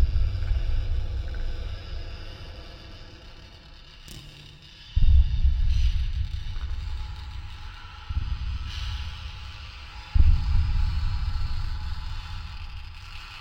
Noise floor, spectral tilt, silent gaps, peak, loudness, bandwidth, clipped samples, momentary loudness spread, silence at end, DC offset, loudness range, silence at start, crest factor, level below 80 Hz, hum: -46 dBFS; -6 dB/octave; none; -6 dBFS; -30 LUFS; 6.6 kHz; under 0.1%; 21 LU; 0 s; under 0.1%; 10 LU; 0 s; 18 dB; -26 dBFS; none